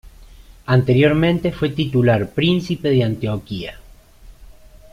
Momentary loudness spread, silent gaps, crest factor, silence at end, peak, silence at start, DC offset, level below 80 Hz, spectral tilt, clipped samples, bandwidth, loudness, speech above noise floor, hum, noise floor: 14 LU; none; 16 dB; 0.5 s; -2 dBFS; 0.05 s; under 0.1%; -42 dBFS; -8 dB/octave; under 0.1%; 13.5 kHz; -18 LUFS; 26 dB; none; -43 dBFS